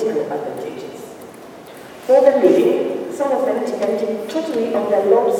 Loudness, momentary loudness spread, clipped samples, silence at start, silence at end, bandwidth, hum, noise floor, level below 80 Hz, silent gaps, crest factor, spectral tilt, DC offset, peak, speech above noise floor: -17 LUFS; 24 LU; under 0.1%; 0 s; 0 s; 16.5 kHz; none; -37 dBFS; -66 dBFS; none; 16 dB; -5.5 dB/octave; under 0.1%; -2 dBFS; 22 dB